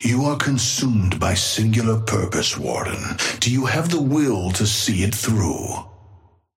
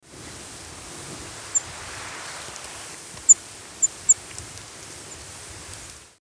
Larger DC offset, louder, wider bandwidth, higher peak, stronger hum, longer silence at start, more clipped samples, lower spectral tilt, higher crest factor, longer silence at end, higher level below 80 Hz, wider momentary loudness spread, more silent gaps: neither; about the same, -20 LUFS vs -20 LUFS; first, 16.5 kHz vs 11 kHz; about the same, -4 dBFS vs -2 dBFS; neither; about the same, 0 s vs 0.05 s; neither; first, -4 dB/octave vs 0 dB/octave; second, 16 dB vs 26 dB; first, 0.4 s vs 0.1 s; first, -44 dBFS vs -54 dBFS; second, 5 LU vs 23 LU; neither